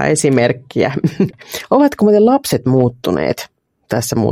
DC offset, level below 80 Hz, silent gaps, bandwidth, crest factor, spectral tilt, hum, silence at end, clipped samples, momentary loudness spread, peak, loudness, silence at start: under 0.1%; -50 dBFS; none; 16.5 kHz; 14 dB; -5.5 dB/octave; none; 0 s; under 0.1%; 9 LU; 0 dBFS; -15 LUFS; 0 s